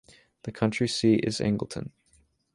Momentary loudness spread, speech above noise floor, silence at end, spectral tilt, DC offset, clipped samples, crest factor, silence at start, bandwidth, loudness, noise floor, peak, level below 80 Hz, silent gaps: 18 LU; 39 dB; 0.65 s; -5.5 dB/octave; under 0.1%; under 0.1%; 18 dB; 0.45 s; 11.5 kHz; -26 LUFS; -65 dBFS; -10 dBFS; -58 dBFS; none